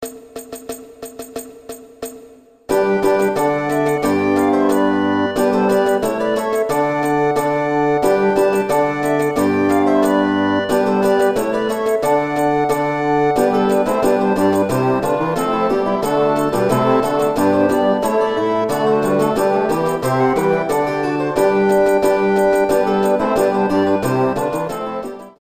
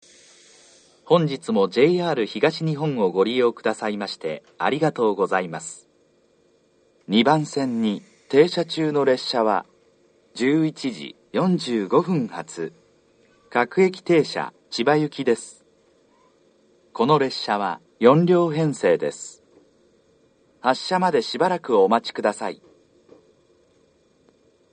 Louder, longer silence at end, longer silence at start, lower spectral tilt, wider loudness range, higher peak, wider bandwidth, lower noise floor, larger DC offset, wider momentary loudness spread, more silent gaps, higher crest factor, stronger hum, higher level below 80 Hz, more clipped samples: first, -16 LUFS vs -22 LUFS; second, 0.1 s vs 2.2 s; second, 0 s vs 1.1 s; about the same, -6 dB/octave vs -6 dB/octave; second, 1 LU vs 4 LU; about the same, -2 dBFS vs 0 dBFS; first, 15.5 kHz vs 9.4 kHz; second, -44 dBFS vs -61 dBFS; first, 0.1% vs under 0.1%; second, 9 LU vs 13 LU; neither; second, 14 dB vs 22 dB; neither; first, -48 dBFS vs -72 dBFS; neither